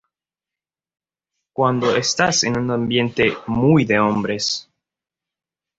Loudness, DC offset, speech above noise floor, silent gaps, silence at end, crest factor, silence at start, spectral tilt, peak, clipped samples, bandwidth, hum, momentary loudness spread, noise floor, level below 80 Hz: -18 LUFS; under 0.1%; 71 dB; none; 1.15 s; 20 dB; 1.6 s; -4.5 dB/octave; -2 dBFS; under 0.1%; 8 kHz; none; 6 LU; -89 dBFS; -52 dBFS